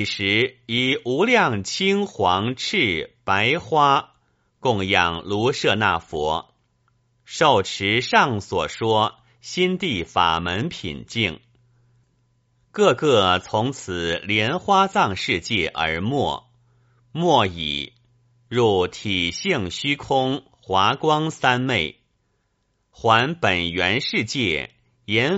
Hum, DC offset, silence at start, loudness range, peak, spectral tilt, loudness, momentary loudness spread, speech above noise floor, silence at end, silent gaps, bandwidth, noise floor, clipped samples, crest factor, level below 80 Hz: none; under 0.1%; 0 s; 3 LU; -2 dBFS; -2.5 dB/octave; -21 LUFS; 9 LU; 49 dB; 0 s; none; 8 kHz; -70 dBFS; under 0.1%; 20 dB; -52 dBFS